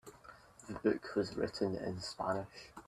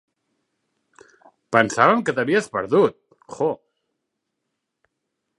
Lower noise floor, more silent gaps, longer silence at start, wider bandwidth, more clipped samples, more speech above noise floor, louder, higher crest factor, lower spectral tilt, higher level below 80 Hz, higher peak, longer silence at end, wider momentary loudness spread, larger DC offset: second, -58 dBFS vs -79 dBFS; neither; second, 0.05 s vs 1.5 s; first, 13.5 kHz vs 11.5 kHz; neither; second, 20 dB vs 60 dB; second, -38 LUFS vs -20 LUFS; about the same, 20 dB vs 24 dB; about the same, -5.5 dB/octave vs -5 dB/octave; about the same, -66 dBFS vs -68 dBFS; second, -20 dBFS vs 0 dBFS; second, 0.05 s vs 1.85 s; first, 20 LU vs 9 LU; neither